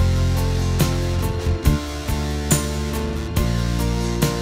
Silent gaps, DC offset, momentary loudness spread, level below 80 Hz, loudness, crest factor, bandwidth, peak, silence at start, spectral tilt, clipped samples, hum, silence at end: none; under 0.1%; 4 LU; -26 dBFS; -22 LUFS; 18 dB; 16 kHz; -2 dBFS; 0 s; -5.5 dB/octave; under 0.1%; none; 0 s